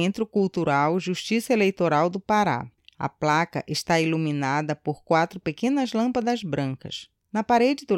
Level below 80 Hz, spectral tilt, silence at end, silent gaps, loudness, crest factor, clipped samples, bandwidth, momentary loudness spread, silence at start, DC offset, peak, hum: -62 dBFS; -5.5 dB/octave; 0 s; none; -24 LUFS; 16 dB; under 0.1%; 16.5 kHz; 9 LU; 0 s; under 0.1%; -8 dBFS; none